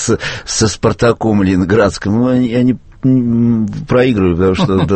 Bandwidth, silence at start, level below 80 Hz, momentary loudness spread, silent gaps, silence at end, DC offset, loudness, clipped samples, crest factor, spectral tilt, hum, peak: 8.8 kHz; 0 s; -36 dBFS; 4 LU; none; 0 s; under 0.1%; -13 LUFS; under 0.1%; 12 dB; -6 dB/octave; none; 0 dBFS